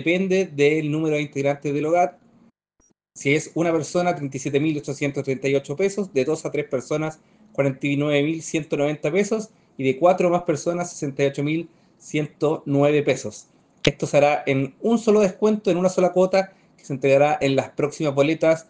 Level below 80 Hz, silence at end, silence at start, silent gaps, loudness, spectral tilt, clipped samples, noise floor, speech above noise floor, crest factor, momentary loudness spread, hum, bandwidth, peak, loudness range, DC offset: -60 dBFS; 0.1 s; 0 s; none; -22 LUFS; -6 dB/octave; under 0.1%; -65 dBFS; 44 dB; 20 dB; 8 LU; none; 10 kHz; 0 dBFS; 4 LU; under 0.1%